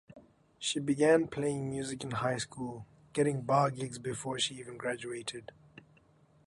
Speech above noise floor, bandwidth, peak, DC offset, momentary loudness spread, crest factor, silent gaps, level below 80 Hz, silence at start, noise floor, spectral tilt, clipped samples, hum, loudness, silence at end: 32 dB; 11.5 kHz; -14 dBFS; under 0.1%; 14 LU; 20 dB; none; -68 dBFS; 0.1 s; -65 dBFS; -4.5 dB/octave; under 0.1%; none; -33 LUFS; 1 s